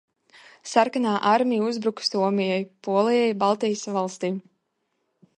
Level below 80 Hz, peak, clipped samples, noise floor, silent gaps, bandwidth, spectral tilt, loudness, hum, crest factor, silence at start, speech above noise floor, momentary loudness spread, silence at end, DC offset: -76 dBFS; -6 dBFS; under 0.1%; -75 dBFS; none; 11 kHz; -5 dB/octave; -23 LUFS; none; 18 dB; 0.65 s; 52 dB; 8 LU; 1 s; under 0.1%